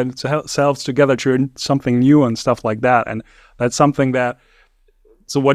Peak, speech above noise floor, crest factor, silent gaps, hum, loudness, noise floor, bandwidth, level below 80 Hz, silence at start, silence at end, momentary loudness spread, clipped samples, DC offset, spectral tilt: 0 dBFS; 38 dB; 16 dB; none; none; -17 LUFS; -55 dBFS; 13.5 kHz; -50 dBFS; 0 s; 0 s; 10 LU; under 0.1%; under 0.1%; -6 dB/octave